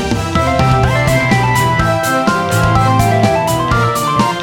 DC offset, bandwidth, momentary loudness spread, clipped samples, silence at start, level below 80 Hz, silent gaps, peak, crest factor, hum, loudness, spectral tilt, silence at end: under 0.1%; 19 kHz; 2 LU; under 0.1%; 0 s; -28 dBFS; none; 0 dBFS; 12 dB; none; -12 LUFS; -5.5 dB/octave; 0 s